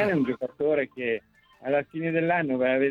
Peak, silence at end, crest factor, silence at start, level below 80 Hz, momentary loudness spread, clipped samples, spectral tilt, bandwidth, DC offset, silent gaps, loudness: -10 dBFS; 0 s; 16 dB; 0 s; -66 dBFS; 6 LU; under 0.1%; -8.5 dB/octave; 5.6 kHz; under 0.1%; none; -27 LUFS